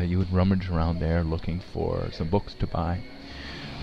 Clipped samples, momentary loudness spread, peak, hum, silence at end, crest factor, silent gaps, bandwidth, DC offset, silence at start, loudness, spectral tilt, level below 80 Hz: under 0.1%; 13 LU; -10 dBFS; none; 0 s; 16 dB; none; 6.4 kHz; under 0.1%; 0 s; -28 LUFS; -8.5 dB/octave; -38 dBFS